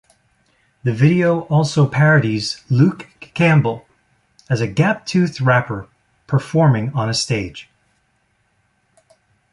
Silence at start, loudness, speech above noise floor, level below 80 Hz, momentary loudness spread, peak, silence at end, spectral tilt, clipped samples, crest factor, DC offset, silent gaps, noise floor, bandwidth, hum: 0.85 s; -17 LUFS; 48 dB; -52 dBFS; 13 LU; -2 dBFS; 1.9 s; -6.5 dB/octave; under 0.1%; 16 dB; under 0.1%; none; -64 dBFS; 11 kHz; none